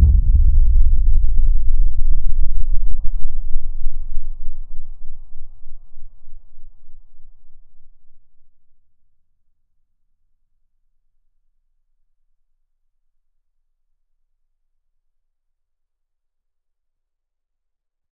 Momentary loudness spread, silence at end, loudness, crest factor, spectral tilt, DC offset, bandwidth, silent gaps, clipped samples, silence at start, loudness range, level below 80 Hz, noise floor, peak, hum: 23 LU; 10 s; -23 LUFS; 14 dB; -17.5 dB/octave; under 0.1%; 0.3 kHz; none; under 0.1%; 0 s; 24 LU; -18 dBFS; -76 dBFS; 0 dBFS; none